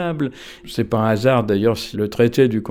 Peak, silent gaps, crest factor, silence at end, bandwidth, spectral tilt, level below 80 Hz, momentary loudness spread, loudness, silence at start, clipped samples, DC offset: -4 dBFS; none; 16 dB; 0 s; 17.5 kHz; -7 dB/octave; -48 dBFS; 10 LU; -19 LUFS; 0 s; under 0.1%; under 0.1%